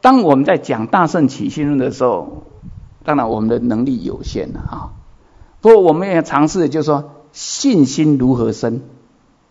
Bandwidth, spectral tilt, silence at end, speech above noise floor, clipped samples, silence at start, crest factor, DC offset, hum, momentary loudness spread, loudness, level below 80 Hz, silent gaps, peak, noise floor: 7.8 kHz; -6 dB/octave; 0.65 s; 38 dB; 0.3%; 0.05 s; 16 dB; under 0.1%; none; 17 LU; -15 LUFS; -40 dBFS; none; 0 dBFS; -52 dBFS